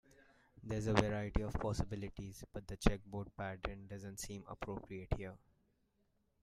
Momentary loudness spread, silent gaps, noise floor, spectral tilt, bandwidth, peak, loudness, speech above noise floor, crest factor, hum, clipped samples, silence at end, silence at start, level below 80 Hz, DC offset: 14 LU; none; -79 dBFS; -6 dB/octave; 15 kHz; -10 dBFS; -42 LUFS; 39 dB; 30 dB; none; under 0.1%; 1.05 s; 0.2 s; -48 dBFS; under 0.1%